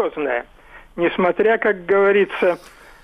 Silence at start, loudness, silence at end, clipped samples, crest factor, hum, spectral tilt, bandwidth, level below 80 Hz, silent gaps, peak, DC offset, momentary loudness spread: 0 s; -18 LUFS; 0.45 s; under 0.1%; 14 dB; none; -6.5 dB/octave; 10.5 kHz; -52 dBFS; none; -6 dBFS; under 0.1%; 10 LU